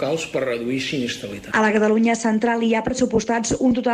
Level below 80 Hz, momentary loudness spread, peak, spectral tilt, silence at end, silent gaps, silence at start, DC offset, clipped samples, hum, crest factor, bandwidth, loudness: -48 dBFS; 7 LU; -6 dBFS; -4.5 dB/octave; 0 s; none; 0 s; under 0.1%; under 0.1%; none; 14 dB; 11.5 kHz; -20 LUFS